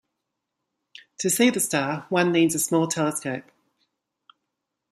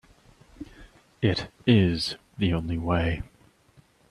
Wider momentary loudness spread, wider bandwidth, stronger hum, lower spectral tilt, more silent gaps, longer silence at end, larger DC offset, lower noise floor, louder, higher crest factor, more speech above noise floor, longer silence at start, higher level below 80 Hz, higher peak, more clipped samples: second, 10 LU vs 24 LU; first, 15 kHz vs 12 kHz; neither; second, -4 dB/octave vs -7 dB/octave; neither; first, 1.5 s vs 0.85 s; neither; first, -82 dBFS vs -59 dBFS; first, -23 LUFS vs -26 LUFS; about the same, 20 dB vs 20 dB; first, 59 dB vs 35 dB; first, 1.2 s vs 0.6 s; second, -70 dBFS vs -46 dBFS; about the same, -6 dBFS vs -8 dBFS; neither